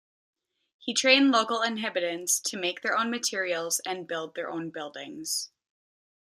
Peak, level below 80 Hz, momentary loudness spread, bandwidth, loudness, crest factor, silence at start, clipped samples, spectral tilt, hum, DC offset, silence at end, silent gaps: -6 dBFS; -82 dBFS; 17 LU; 15.5 kHz; -27 LUFS; 24 dB; 0.8 s; under 0.1%; -1.5 dB/octave; none; under 0.1%; 0.9 s; none